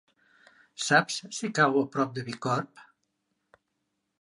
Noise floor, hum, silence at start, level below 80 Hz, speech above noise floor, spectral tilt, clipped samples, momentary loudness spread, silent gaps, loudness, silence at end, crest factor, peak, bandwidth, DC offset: -80 dBFS; none; 0.8 s; -78 dBFS; 53 dB; -4 dB/octave; under 0.1%; 10 LU; none; -27 LUFS; 1.4 s; 22 dB; -8 dBFS; 11.5 kHz; under 0.1%